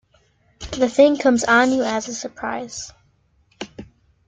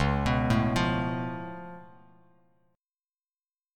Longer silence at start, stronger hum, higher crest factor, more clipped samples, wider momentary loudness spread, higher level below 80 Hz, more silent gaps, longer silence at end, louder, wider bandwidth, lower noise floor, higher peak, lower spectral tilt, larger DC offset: first, 0.6 s vs 0 s; neither; about the same, 20 dB vs 18 dB; neither; first, 21 LU vs 18 LU; second, -50 dBFS vs -42 dBFS; neither; second, 0.45 s vs 1.9 s; first, -18 LUFS vs -28 LUFS; second, 9.4 kHz vs 13.5 kHz; second, -61 dBFS vs under -90 dBFS; first, -2 dBFS vs -12 dBFS; second, -3.5 dB/octave vs -6.5 dB/octave; neither